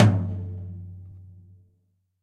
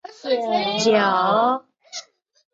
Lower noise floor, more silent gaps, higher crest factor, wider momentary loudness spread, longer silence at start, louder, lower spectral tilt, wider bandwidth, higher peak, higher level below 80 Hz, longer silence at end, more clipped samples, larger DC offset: first, -69 dBFS vs -41 dBFS; neither; first, 24 dB vs 18 dB; first, 23 LU vs 18 LU; about the same, 0 s vs 0.05 s; second, -28 LUFS vs -20 LUFS; first, -8 dB/octave vs -3.5 dB/octave; about the same, 8.8 kHz vs 8 kHz; about the same, -2 dBFS vs -4 dBFS; first, -54 dBFS vs -68 dBFS; first, 0.8 s vs 0.55 s; neither; neither